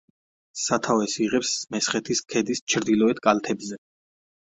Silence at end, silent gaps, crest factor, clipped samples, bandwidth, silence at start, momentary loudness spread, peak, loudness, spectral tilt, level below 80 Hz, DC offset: 0.65 s; 2.61-2.67 s; 22 dB; under 0.1%; 8.4 kHz; 0.55 s; 10 LU; -2 dBFS; -24 LUFS; -3 dB/octave; -64 dBFS; under 0.1%